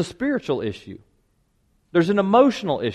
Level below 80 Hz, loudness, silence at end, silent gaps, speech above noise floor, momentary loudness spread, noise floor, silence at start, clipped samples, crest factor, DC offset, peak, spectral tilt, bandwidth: -58 dBFS; -21 LUFS; 0 s; none; 45 dB; 16 LU; -65 dBFS; 0 s; under 0.1%; 18 dB; under 0.1%; -4 dBFS; -6.5 dB/octave; 11.5 kHz